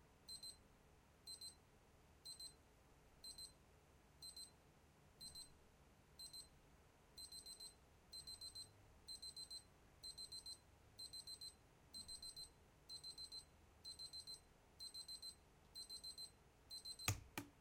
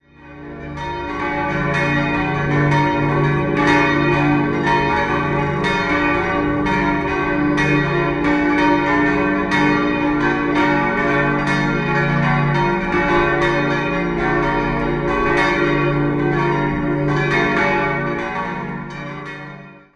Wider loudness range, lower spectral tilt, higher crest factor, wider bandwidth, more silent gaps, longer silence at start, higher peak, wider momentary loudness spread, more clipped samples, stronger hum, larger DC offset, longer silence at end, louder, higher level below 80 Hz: first, 5 LU vs 2 LU; second, -1.5 dB/octave vs -7 dB/octave; first, 38 dB vs 16 dB; first, 16.5 kHz vs 10 kHz; neither; second, 0 s vs 0.25 s; second, -20 dBFS vs -2 dBFS; about the same, 8 LU vs 8 LU; neither; neither; neither; second, 0 s vs 0.2 s; second, -55 LUFS vs -17 LUFS; second, -74 dBFS vs -36 dBFS